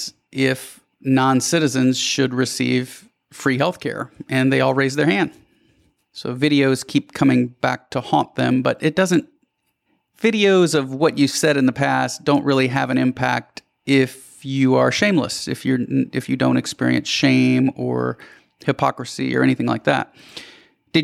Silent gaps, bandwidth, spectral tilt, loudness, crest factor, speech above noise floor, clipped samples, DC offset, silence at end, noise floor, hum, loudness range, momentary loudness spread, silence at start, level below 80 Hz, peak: none; 14.5 kHz; -5 dB/octave; -19 LUFS; 16 dB; 50 dB; under 0.1%; under 0.1%; 0 s; -69 dBFS; none; 3 LU; 11 LU; 0 s; -60 dBFS; -4 dBFS